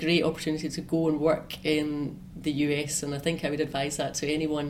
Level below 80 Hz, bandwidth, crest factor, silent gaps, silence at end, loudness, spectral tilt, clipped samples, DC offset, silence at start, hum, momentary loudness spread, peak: -54 dBFS; 16 kHz; 16 dB; none; 0 s; -28 LUFS; -4.5 dB/octave; under 0.1%; under 0.1%; 0 s; none; 7 LU; -12 dBFS